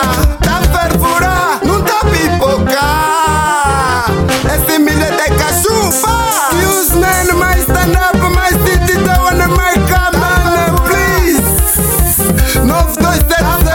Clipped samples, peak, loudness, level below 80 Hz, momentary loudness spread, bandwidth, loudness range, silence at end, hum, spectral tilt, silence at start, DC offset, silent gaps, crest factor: under 0.1%; 0 dBFS; -10 LUFS; -16 dBFS; 2 LU; 17.5 kHz; 1 LU; 0 s; none; -4 dB/octave; 0 s; under 0.1%; none; 10 dB